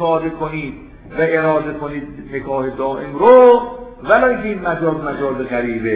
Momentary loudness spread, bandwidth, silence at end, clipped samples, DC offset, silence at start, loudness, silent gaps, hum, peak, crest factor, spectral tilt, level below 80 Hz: 18 LU; 4 kHz; 0 s; under 0.1%; under 0.1%; 0 s; -15 LUFS; none; none; 0 dBFS; 16 dB; -10.5 dB/octave; -42 dBFS